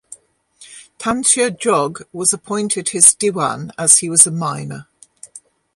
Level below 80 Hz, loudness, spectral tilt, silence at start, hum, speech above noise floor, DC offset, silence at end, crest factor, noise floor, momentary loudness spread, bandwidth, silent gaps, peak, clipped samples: -58 dBFS; -14 LUFS; -2.5 dB/octave; 0.1 s; none; 32 dB; under 0.1%; 0.4 s; 18 dB; -48 dBFS; 14 LU; 16 kHz; none; 0 dBFS; 0.1%